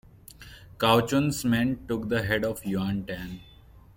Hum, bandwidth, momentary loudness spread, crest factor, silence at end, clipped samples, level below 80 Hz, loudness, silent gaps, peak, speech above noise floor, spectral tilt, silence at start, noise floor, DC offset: none; 17 kHz; 23 LU; 20 dB; 0.15 s; under 0.1%; -50 dBFS; -26 LUFS; none; -8 dBFS; 22 dB; -5.5 dB/octave; 0.4 s; -48 dBFS; under 0.1%